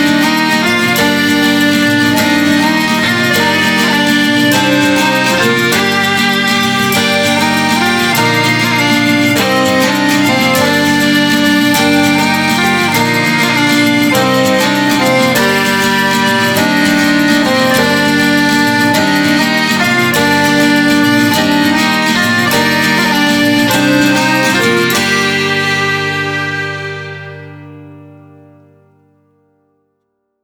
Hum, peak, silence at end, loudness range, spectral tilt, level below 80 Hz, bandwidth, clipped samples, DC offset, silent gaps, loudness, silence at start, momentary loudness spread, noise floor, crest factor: none; 0 dBFS; 2.35 s; 2 LU; -3.5 dB/octave; -48 dBFS; over 20 kHz; under 0.1%; under 0.1%; none; -10 LUFS; 0 s; 1 LU; -66 dBFS; 10 dB